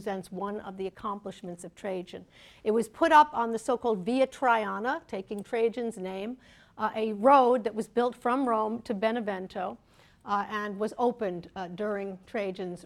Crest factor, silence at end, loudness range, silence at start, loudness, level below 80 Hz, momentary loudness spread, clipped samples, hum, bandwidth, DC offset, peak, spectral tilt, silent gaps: 22 dB; 0.05 s; 6 LU; 0 s; -29 LUFS; -66 dBFS; 17 LU; under 0.1%; none; 13.5 kHz; under 0.1%; -8 dBFS; -5.5 dB/octave; none